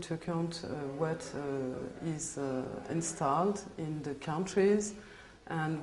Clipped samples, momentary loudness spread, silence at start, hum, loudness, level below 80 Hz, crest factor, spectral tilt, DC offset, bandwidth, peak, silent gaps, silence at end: under 0.1%; 10 LU; 0 s; none; -35 LUFS; -62 dBFS; 18 dB; -5.5 dB/octave; under 0.1%; 11.5 kHz; -16 dBFS; none; 0 s